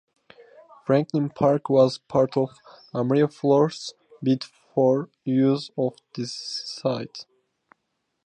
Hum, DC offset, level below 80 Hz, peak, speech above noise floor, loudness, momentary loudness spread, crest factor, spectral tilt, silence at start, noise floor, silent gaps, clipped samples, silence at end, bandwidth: none; under 0.1%; -66 dBFS; -6 dBFS; 54 dB; -24 LUFS; 13 LU; 18 dB; -7 dB/octave; 0.9 s; -77 dBFS; none; under 0.1%; 1.05 s; 9.6 kHz